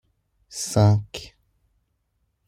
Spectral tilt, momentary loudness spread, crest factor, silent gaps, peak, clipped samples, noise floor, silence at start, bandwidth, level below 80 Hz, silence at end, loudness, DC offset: -6 dB/octave; 19 LU; 20 dB; none; -6 dBFS; under 0.1%; -72 dBFS; 0.5 s; 13.5 kHz; -56 dBFS; 1.2 s; -21 LUFS; under 0.1%